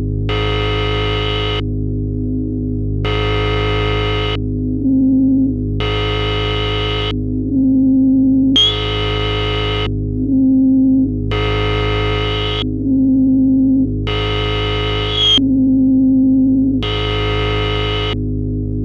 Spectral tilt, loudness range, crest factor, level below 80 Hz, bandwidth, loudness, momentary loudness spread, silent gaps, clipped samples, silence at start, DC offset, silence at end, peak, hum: -7 dB/octave; 4 LU; 12 dB; -26 dBFS; 7 kHz; -15 LUFS; 8 LU; none; under 0.1%; 0 s; under 0.1%; 0 s; -4 dBFS; 50 Hz at -40 dBFS